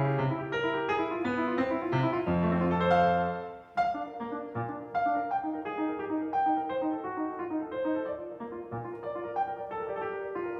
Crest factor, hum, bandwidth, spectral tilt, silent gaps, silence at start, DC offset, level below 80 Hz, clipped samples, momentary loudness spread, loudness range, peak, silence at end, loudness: 18 dB; none; 7.6 kHz; -8.5 dB/octave; none; 0 s; under 0.1%; -64 dBFS; under 0.1%; 10 LU; 6 LU; -12 dBFS; 0 s; -31 LUFS